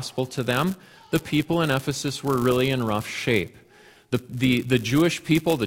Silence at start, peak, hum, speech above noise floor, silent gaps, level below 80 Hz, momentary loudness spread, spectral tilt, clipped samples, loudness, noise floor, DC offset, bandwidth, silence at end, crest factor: 0 s; -6 dBFS; none; 29 dB; none; -52 dBFS; 8 LU; -5.5 dB/octave; under 0.1%; -24 LUFS; -53 dBFS; under 0.1%; 17 kHz; 0 s; 18 dB